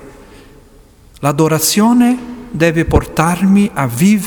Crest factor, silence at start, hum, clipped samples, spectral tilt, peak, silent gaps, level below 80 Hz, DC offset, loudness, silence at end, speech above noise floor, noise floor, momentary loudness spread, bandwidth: 14 dB; 0 s; none; under 0.1%; -5.5 dB/octave; 0 dBFS; none; -30 dBFS; under 0.1%; -13 LUFS; 0 s; 31 dB; -43 dBFS; 8 LU; over 20 kHz